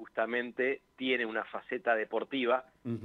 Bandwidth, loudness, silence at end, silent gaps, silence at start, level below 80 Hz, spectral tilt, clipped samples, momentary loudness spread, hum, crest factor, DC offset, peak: 6.4 kHz; -33 LUFS; 0 s; none; 0 s; -78 dBFS; -7 dB/octave; under 0.1%; 6 LU; none; 18 dB; under 0.1%; -16 dBFS